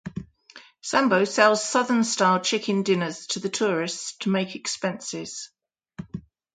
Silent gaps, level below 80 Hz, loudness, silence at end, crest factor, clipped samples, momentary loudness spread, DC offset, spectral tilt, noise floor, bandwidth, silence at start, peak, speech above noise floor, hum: none; -62 dBFS; -23 LUFS; 0.35 s; 22 dB; under 0.1%; 19 LU; under 0.1%; -3.5 dB/octave; -51 dBFS; 9.6 kHz; 0.05 s; -4 dBFS; 27 dB; none